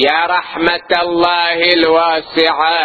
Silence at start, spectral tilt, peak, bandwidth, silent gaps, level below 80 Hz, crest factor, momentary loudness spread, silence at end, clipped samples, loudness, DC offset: 0 s; -5 dB/octave; 0 dBFS; 8 kHz; none; -50 dBFS; 12 dB; 5 LU; 0 s; under 0.1%; -12 LUFS; under 0.1%